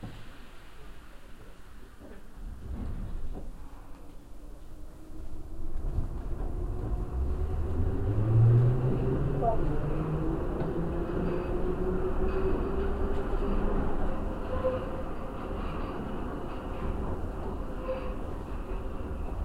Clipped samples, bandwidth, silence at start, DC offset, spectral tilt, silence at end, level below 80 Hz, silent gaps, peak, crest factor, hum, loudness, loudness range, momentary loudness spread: under 0.1%; 9.8 kHz; 0 s; 0.4%; -9 dB/octave; 0 s; -34 dBFS; none; -12 dBFS; 16 dB; none; -32 LUFS; 17 LU; 21 LU